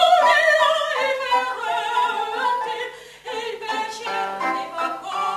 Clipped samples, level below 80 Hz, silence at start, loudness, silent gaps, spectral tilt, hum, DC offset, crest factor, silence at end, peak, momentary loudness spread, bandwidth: under 0.1%; -66 dBFS; 0 s; -21 LUFS; none; -1 dB/octave; none; under 0.1%; 18 dB; 0 s; -2 dBFS; 14 LU; 14 kHz